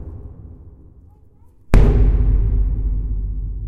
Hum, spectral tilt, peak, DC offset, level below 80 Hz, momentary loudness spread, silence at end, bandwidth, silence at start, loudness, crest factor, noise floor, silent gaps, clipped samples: none; -9 dB/octave; 0 dBFS; under 0.1%; -18 dBFS; 23 LU; 0 s; 4.7 kHz; 0 s; -19 LUFS; 18 dB; -47 dBFS; none; under 0.1%